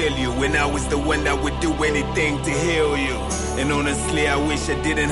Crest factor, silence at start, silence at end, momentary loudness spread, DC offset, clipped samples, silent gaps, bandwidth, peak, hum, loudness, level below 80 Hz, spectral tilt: 14 dB; 0 s; 0 s; 3 LU; under 0.1%; under 0.1%; none; 11.5 kHz; -8 dBFS; none; -21 LUFS; -30 dBFS; -4.5 dB/octave